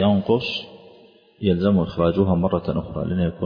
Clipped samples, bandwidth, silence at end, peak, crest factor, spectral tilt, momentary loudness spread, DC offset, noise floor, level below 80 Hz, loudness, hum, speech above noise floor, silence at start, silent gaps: under 0.1%; 5.2 kHz; 0 s; -6 dBFS; 16 dB; -9 dB/octave; 8 LU; under 0.1%; -51 dBFS; -44 dBFS; -22 LUFS; none; 31 dB; 0 s; none